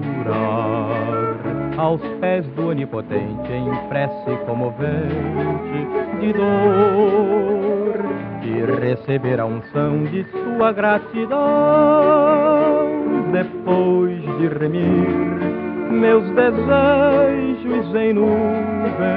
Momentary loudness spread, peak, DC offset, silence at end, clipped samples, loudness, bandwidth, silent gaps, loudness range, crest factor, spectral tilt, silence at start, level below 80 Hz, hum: 9 LU; -2 dBFS; under 0.1%; 0 s; under 0.1%; -18 LUFS; 5 kHz; none; 6 LU; 16 dB; -7 dB/octave; 0 s; -48 dBFS; none